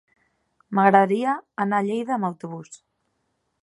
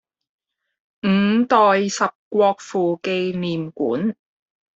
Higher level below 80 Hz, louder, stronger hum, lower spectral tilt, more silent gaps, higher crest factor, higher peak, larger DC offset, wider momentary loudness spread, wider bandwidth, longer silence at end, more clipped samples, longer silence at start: second, -76 dBFS vs -64 dBFS; about the same, -22 LUFS vs -20 LUFS; neither; first, -7 dB/octave vs -5.5 dB/octave; second, none vs 2.15-2.31 s; about the same, 22 dB vs 18 dB; about the same, -2 dBFS vs -2 dBFS; neither; first, 18 LU vs 10 LU; first, 11 kHz vs 8 kHz; first, 0.85 s vs 0.65 s; neither; second, 0.7 s vs 1.05 s